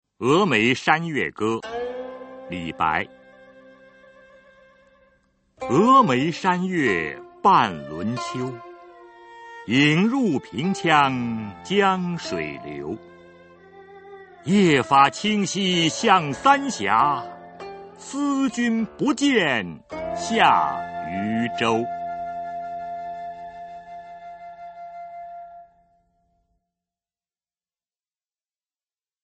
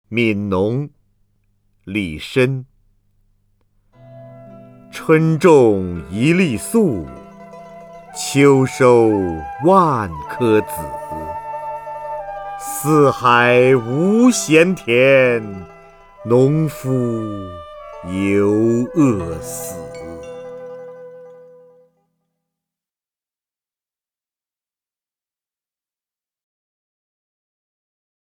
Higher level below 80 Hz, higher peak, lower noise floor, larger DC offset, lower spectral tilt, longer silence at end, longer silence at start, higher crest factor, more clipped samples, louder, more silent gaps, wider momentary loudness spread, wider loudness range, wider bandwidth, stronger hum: second, -60 dBFS vs -48 dBFS; about the same, -2 dBFS vs 0 dBFS; about the same, under -90 dBFS vs under -90 dBFS; neither; about the same, -5 dB/octave vs -6 dB/octave; second, 3.6 s vs 7.05 s; about the same, 0.2 s vs 0.1 s; about the same, 22 dB vs 18 dB; neither; second, -21 LUFS vs -16 LUFS; neither; about the same, 21 LU vs 21 LU; first, 15 LU vs 11 LU; second, 8.8 kHz vs 20 kHz; neither